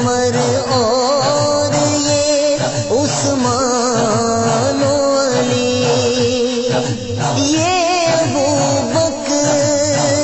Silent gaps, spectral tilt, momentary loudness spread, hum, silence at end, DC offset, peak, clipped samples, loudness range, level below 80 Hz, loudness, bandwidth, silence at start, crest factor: none; -4 dB/octave; 3 LU; none; 0 s; under 0.1%; -4 dBFS; under 0.1%; 1 LU; -44 dBFS; -15 LUFS; 8.4 kHz; 0 s; 12 dB